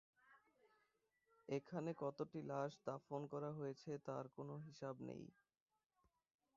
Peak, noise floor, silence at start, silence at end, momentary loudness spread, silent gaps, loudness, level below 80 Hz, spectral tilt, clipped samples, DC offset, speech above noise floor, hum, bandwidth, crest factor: -30 dBFS; -85 dBFS; 0.25 s; 1.25 s; 7 LU; none; -50 LUFS; -88 dBFS; -7 dB/octave; under 0.1%; under 0.1%; 36 dB; none; 7.2 kHz; 20 dB